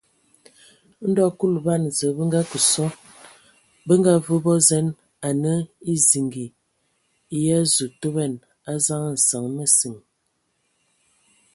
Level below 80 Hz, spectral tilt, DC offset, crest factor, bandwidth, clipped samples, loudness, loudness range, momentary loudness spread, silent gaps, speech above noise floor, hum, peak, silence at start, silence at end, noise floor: -64 dBFS; -4.5 dB/octave; under 0.1%; 20 dB; 12 kHz; under 0.1%; -20 LUFS; 3 LU; 12 LU; none; 51 dB; none; -2 dBFS; 1 s; 1.55 s; -71 dBFS